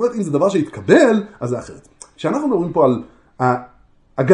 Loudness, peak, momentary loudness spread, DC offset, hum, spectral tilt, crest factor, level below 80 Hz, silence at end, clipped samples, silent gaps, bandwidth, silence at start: -18 LUFS; 0 dBFS; 13 LU; under 0.1%; none; -7 dB/octave; 18 dB; -54 dBFS; 0 s; under 0.1%; none; 10.5 kHz; 0 s